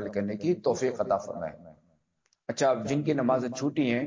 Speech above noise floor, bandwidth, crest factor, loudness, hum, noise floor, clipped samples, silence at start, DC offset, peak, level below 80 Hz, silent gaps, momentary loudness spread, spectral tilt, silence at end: 47 dB; 7.6 kHz; 16 dB; -28 LUFS; none; -74 dBFS; under 0.1%; 0 s; under 0.1%; -12 dBFS; -64 dBFS; none; 11 LU; -6 dB/octave; 0 s